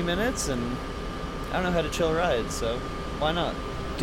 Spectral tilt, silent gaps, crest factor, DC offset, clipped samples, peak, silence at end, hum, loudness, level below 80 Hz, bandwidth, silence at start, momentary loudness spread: -4.5 dB/octave; none; 14 dB; under 0.1%; under 0.1%; -14 dBFS; 0 s; none; -28 LUFS; -38 dBFS; 17 kHz; 0 s; 9 LU